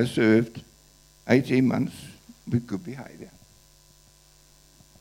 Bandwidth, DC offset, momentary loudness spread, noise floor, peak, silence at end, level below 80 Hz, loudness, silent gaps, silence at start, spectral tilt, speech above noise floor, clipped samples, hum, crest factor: 16.5 kHz; under 0.1%; 25 LU; -56 dBFS; -4 dBFS; 1.75 s; -60 dBFS; -24 LUFS; none; 0 s; -7 dB/octave; 32 dB; under 0.1%; none; 24 dB